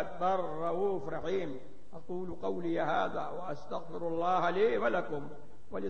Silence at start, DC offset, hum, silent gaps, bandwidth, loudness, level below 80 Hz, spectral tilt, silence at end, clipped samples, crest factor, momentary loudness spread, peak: 0 s; 1%; none; none; 8.8 kHz; -34 LUFS; -64 dBFS; -7 dB/octave; 0 s; under 0.1%; 16 dB; 14 LU; -16 dBFS